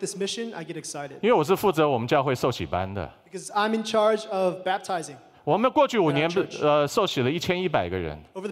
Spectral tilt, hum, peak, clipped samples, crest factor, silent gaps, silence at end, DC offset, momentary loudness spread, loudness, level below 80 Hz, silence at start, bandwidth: -5 dB/octave; none; -8 dBFS; under 0.1%; 16 dB; none; 0 s; under 0.1%; 13 LU; -25 LUFS; -56 dBFS; 0 s; 16 kHz